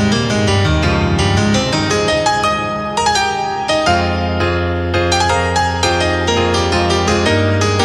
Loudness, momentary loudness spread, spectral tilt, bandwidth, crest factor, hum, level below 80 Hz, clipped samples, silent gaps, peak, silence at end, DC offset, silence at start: -14 LUFS; 3 LU; -4.5 dB/octave; 12 kHz; 14 dB; none; -30 dBFS; under 0.1%; none; -2 dBFS; 0 s; under 0.1%; 0 s